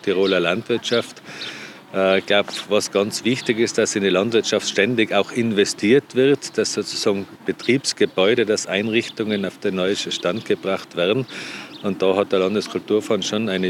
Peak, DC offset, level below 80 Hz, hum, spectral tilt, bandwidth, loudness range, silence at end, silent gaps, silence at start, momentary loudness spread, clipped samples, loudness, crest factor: -4 dBFS; under 0.1%; -76 dBFS; none; -4 dB/octave; 14.5 kHz; 3 LU; 0 s; none; 0.05 s; 8 LU; under 0.1%; -20 LUFS; 16 dB